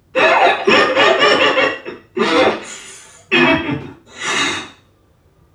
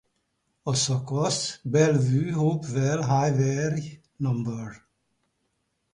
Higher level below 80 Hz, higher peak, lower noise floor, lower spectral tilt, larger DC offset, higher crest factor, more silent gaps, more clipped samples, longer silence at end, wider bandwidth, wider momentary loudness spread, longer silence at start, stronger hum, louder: first, -52 dBFS vs -58 dBFS; first, 0 dBFS vs -8 dBFS; second, -54 dBFS vs -75 dBFS; second, -3 dB/octave vs -5.5 dB/octave; neither; about the same, 16 dB vs 18 dB; neither; neither; second, 0.85 s vs 1.15 s; first, 12.5 kHz vs 11 kHz; first, 16 LU vs 11 LU; second, 0.15 s vs 0.65 s; neither; first, -13 LUFS vs -25 LUFS